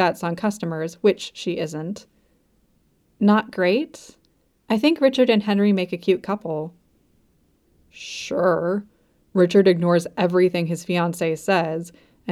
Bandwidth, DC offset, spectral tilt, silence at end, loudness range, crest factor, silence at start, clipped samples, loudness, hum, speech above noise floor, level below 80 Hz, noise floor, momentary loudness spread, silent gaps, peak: 13.5 kHz; under 0.1%; -6 dB/octave; 0 s; 5 LU; 18 dB; 0 s; under 0.1%; -21 LUFS; none; 42 dB; -64 dBFS; -63 dBFS; 14 LU; none; -4 dBFS